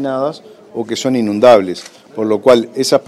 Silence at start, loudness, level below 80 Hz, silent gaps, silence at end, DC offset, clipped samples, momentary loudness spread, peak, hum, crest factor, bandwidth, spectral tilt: 0 s; -13 LUFS; -52 dBFS; none; 0.05 s; under 0.1%; 0.4%; 19 LU; 0 dBFS; none; 14 dB; 14 kHz; -4.5 dB/octave